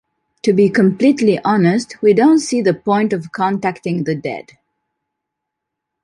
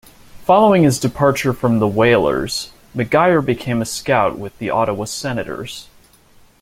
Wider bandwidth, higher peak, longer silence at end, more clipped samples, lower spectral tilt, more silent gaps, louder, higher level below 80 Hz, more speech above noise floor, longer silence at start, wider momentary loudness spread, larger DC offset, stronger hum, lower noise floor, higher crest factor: second, 11.5 kHz vs 16.5 kHz; about the same, -2 dBFS vs -2 dBFS; first, 1.65 s vs 0.8 s; neither; about the same, -6.5 dB/octave vs -5.5 dB/octave; neither; about the same, -15 LUFS vs -17 LUFS; second, -60 dBFS vs -46 dBFS; first, 65 dB vs 33 dB; about the same, 0.45 s vs 0.35 s; second, 9 LU vs 13 LU; neither; neither; first, -79 dBFS vs -49 dBFS; about the same, 14 dB vs 16 dB